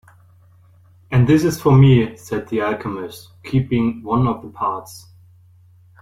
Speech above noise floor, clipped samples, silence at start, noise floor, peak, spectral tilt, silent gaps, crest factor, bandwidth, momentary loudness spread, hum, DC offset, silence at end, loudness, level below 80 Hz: 32 dB; under 0.1%; 1.1 s; -50 dBFS; -2 dBFS; -7.5 dB/octave; none; 16 dB; 15.5 kHz; 18 LU; none; under 0.1%; 1.05 s; -18 LUFS; -44 dBFS